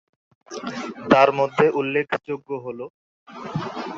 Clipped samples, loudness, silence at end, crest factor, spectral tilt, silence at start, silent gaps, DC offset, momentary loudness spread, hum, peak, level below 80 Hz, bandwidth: under 0.1%; -22 LUFS; 0 s; 22 dB; -6 dB/octave; 0.5 s; 2.90-3.26 s; under 0.1%; 20 LU; none; -2 dBFS; -60 dBFS; 7.6 kHz